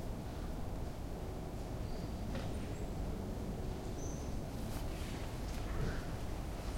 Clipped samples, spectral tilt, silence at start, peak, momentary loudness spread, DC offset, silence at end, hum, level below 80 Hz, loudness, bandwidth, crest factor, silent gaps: under 0.1%; -6 dB/octave; 0 s; -26 dBFS; 3 LU; under 0.1%; 0 s; none; -44 dBFS; -43 LUFS; 16.5 kHz; 16 dB; none